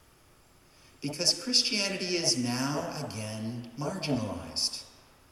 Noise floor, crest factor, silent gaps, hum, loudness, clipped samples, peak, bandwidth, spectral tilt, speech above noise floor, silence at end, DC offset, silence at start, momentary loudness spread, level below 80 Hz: -60 dBFS; 22 dB; none; none; -29 LUFS; under 0.1%; -10 dBFS; 16 kHz; -3 dB/octave; 29 dB; 0.4 s; under 0.1%; 1 s; 13 LU; -64 dBFS